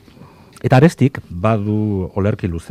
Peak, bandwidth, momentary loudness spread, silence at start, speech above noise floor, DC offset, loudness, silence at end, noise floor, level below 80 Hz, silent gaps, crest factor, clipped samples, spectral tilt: 0 dBFS; 13 kHz; 9 LU; 0.2 s; 27 dB; under 0.1%; -17 LUFS; 0.1 s; -43 dBFS; -46 dBFS; none; 16 dB; under 0.1%; -8 dB/octave